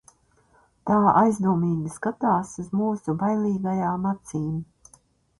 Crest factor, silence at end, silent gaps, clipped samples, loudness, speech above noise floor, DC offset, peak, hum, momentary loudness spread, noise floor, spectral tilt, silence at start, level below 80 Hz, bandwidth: 20 dB; 0.75 s; none; under 0.1%; -24 LUFS; 38 dB; under 0.1%; -4 dBFS; none; 11 LU; -61 dBFS; -8.5 dB/octave; 0.85 s; -58 dBFS; 11.5 kHz